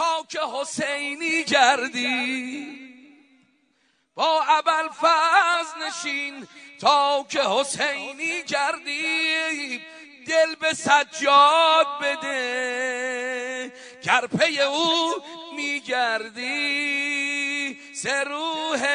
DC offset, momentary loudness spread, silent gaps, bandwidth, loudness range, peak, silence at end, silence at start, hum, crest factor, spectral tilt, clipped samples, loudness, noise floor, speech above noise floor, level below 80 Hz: under 0.1%; 13 LU; none; 11 kHz; 4 LU; -2 dBFS; 0 s; 0 s; none; 20 dB; -1.5 dB/octave; under 0.1%; -22 LUFS; -67 dBFS; 44 dB; -74 dBFS